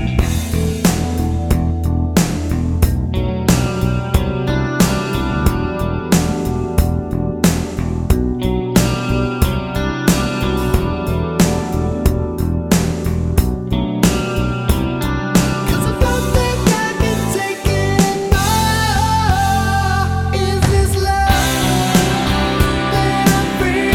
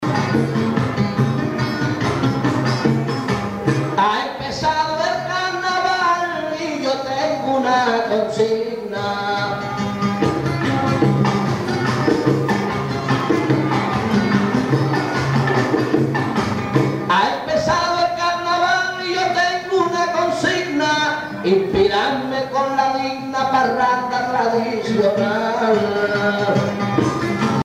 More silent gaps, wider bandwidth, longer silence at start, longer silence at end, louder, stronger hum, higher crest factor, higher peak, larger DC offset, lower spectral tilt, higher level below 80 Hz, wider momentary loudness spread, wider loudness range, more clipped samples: neither; first, 18.5 kHz vs 15 kHz; about the same, 0 s vs 0 s; about the same, 0 s vs 0 s; first, -16 LUFS vs -19 LUFS; neither; about the same, 16 dB vs 16 dB; about the same, 0 dBFS vs -2 dBFS; neither; about the same, -5.5 dB/octave vs -6 dB/octave; first, -22 dBFS vs -48 dBFS; about the same, 5 LU vs 4 LU; about the same, 2 LU vs 2 LU; neither